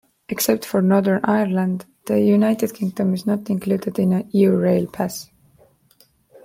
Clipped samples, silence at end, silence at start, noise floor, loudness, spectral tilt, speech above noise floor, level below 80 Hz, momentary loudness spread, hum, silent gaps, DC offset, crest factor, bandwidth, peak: under 0.1%; 1.2 s; 0.3 s; -57 dBFS; -20 LUFS; -6.5 dB/octave; 38 dB; -60 dBFS; 9 LU; none; none; under 0.1%; 16 dB; 16.5 kHz; -4 dBFS